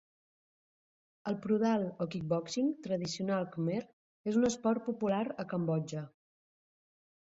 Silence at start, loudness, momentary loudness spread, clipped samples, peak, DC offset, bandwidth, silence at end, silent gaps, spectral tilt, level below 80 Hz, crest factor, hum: 1.25 s; -34 LUFS; 9 LU; under 0.1%; -18 dBFS; under 0.1%; 8 kHz; 1.2 s; 3.93-4.24 s; -6 dB/octave; -72 dBFS; 16 dB; none